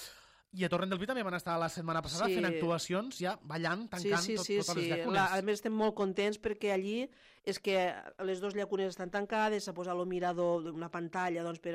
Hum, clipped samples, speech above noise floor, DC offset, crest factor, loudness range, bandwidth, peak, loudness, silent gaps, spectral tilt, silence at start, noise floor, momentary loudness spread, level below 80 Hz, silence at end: none; under 0.1%; 21 dB; under 0.1%; 14 dB; 2 LU; 15.5 kHz; -20 dBFS; -34 LUFS; none; -4.5 dB/octave; 0 s; -56 dBFS; 6 LU; -68 dBFS; 0 s